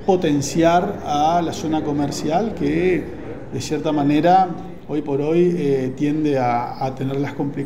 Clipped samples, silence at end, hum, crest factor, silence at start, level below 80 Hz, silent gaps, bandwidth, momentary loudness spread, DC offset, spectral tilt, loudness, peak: under 0.1%; 0 s; none; 16 dB; 0 s; -46 dBFS; none; 15.5 kHz; 9 LU; 1%; -6 dB/octave; -20 LUFS; -2 dBFS